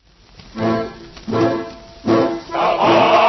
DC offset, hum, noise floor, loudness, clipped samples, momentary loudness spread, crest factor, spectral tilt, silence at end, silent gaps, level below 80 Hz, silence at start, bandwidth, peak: under 0.1%; none; -44 dBFS; -18 LUFS; under 0.1%; 18 LU; 16 dB; -6 dB/octave; 0 s; none; -48 dBFS; 0.55 s; 6.2 kHz; -2 dBFS